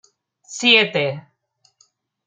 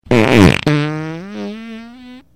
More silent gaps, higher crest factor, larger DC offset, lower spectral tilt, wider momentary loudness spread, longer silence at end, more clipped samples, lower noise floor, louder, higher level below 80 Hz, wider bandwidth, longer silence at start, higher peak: neither; first, 22 dB vs 14 dB; neither; second, -3 dB/octave vs -6.5 dB/octave; about the same, 22 LU vs 21 LU; first, 1.05 s vs 0.15 s; neither; first, -64 dBFS vs -37 dBFS; second, -16 LUFS vs -12 LUFS; second, -74 dBFS vs -36 dBFS; second, 13.5 kHz vs 16 kHz; first, 0.5 s vs 0.05 s; about the same, -2 dBFS vs 0 dBFS